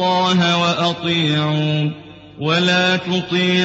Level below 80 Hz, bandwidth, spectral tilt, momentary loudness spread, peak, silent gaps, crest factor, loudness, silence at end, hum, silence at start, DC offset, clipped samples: -56 dBFS; 8 kHz; -5 dB/octave; 6 LU; -4 dBFS; none; 12 dB; -17 LUFS; 0 s; none; 0 s; under 0.1%; under 0.1%